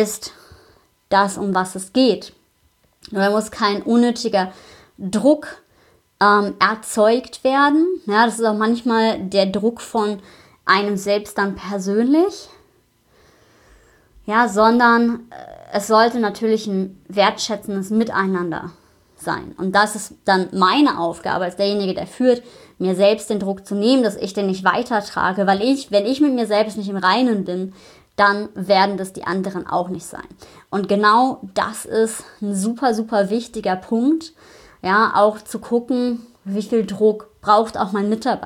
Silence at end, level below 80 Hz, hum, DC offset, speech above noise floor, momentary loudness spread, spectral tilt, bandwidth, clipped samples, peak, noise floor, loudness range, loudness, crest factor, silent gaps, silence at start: 0 s; -58 dBFS; none; under 0.1%; 42 dB; 11 LU; -5 dB/octave; 15.5 kHz; under 0.1%; 0 dBFS; -60 dBFS; 4 LU; -19 LUFS; 18 dB; none; 0 s